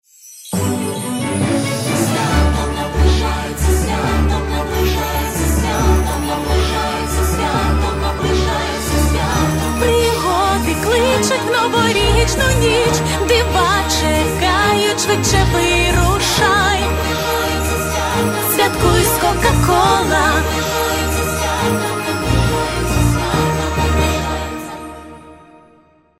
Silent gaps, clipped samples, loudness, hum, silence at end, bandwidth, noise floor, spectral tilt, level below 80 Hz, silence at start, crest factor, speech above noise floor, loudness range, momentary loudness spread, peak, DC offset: none; under 0.1%; -15 LUFS; none; 0.85 s; 16 kHz; -51 dBFS; -4.5 dB/octave; -22 dBFS; 0.25 s; 14 dB; 37 dB; 3 LU; 6 LU; 0 dBFS; under 0.1%